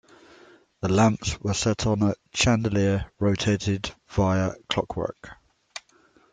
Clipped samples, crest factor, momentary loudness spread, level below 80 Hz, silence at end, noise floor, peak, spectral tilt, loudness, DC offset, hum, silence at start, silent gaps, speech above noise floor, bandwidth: under 0.1%; 20 dB; 12 LU; -46 dBFS; 0.55 s; -60 dBFS; -4 dBFS; -5 dB/octave; -25 LUFS; under 0.1%; none; 0.85 s; none; 36 dB; 9.4 kHz